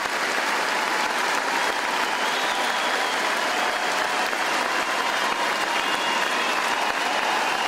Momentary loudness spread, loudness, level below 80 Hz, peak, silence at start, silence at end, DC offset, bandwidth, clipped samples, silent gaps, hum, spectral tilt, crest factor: 1 LU; -22 LUFS; -64 dBFS; -8 dBFS; 0 s; 0 s; under 0.1%; 16 kHz; under 0.1%; none; none; -0.5 dB/octave; 16 dB